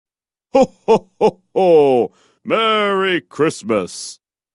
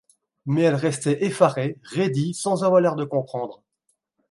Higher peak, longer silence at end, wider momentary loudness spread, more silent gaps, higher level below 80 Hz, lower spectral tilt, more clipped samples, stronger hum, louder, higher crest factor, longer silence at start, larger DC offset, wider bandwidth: about the same, -2 dBFS vs -2 dBFS; second, 0.45 s vs 0.75 s; about the same, 13 LU vs 11 LU; neither; first, -56 dBFS vs -68 dBFS; second, -4.5 dB/octave vs -6 dB/octave; neither; neither; first, -16 LUFS vs -22 LUFS; about the same, 16 dB vs 20 dB; about the same, 0.55 s vs 0.45 s; neither; about the same, 11.5 kHz vs 11.5 kHz